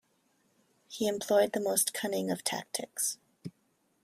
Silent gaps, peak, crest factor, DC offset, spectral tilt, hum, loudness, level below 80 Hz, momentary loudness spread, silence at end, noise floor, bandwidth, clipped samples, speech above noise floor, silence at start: none; -12 dBFS; 22 dB; under 0.1%; -2.5 dB/octave; none; -31 LUFS; -76 dBFS; 20 LU; 0.55 s; -73 dBFS; 16 kHz; under 0.1%; 42 dB; 0.9 s